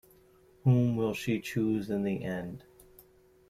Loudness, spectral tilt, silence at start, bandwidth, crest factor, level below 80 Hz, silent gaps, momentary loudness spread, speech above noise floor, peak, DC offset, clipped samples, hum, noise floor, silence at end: -30 LUFS; -7.5 dB/octave; 0.65 s; 15 kHz; 18 dB; -60 dBFS; none; 12 LU; 32 dB; -12 dBFS; under 0.1%; under 0.1%; none; -61 dBFS; 0.9 s